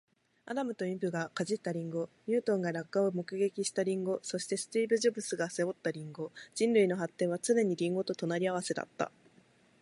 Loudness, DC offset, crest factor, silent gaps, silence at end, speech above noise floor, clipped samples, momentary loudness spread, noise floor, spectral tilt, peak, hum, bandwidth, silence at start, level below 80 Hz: -33 LUFS; under 0.1%; 18 dB; none; 0.75 s; 32 dB; under 0.1%; 9 LU; -65 dBFS; -5 dB/octave; -16 dBFS; none; 11.5 kHz; 0.45 s; -82 dBFS